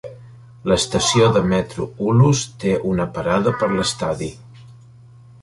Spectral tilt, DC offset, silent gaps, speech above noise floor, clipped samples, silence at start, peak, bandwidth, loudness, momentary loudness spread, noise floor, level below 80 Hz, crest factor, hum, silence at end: -5 dB/octave; under 0.1%; none; 27 dB; under 0.1%; 0.05 s; -2 dBFS; 11.5 kHz; -19 LUFS; 12 LU; -45 dBFS; -44 dBFS; 18 dB; none; 0.7 s